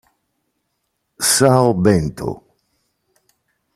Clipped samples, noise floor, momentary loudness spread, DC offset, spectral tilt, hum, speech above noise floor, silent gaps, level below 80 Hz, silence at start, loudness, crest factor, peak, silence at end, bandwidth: under 0.1%; -72 dBFS; 16 LU; under 0.1%; -4.5 dB/octave; none; 57 dB; none; -46 dBFS; 1.2 s; -15 LUFS; 18 dB; -2 dBFS; 1.4 s; 15.5 kHz